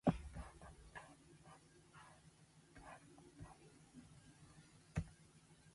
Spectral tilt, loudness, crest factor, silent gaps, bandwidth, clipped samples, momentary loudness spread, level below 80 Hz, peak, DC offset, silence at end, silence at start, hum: -7 dB/octave; -55 LUFS; 30 dB; none; 11.5 kHz; under 0.1%; 17 LU; -62 dBFS; -22 dBFS; under 0.1%; 0 s; 0.05 s; none